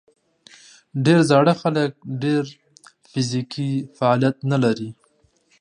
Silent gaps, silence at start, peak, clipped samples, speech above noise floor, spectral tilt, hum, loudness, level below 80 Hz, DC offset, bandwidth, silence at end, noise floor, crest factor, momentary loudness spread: none; 0.95 s; -2 dBFS; under 0.1%; 42 dB; -6.5 dB/octave; none; -20 LUFS; -66 dBFS; under 0.1%; 11 kHz; 0.7 s; -62 dBFS; 20 dB; 13 LU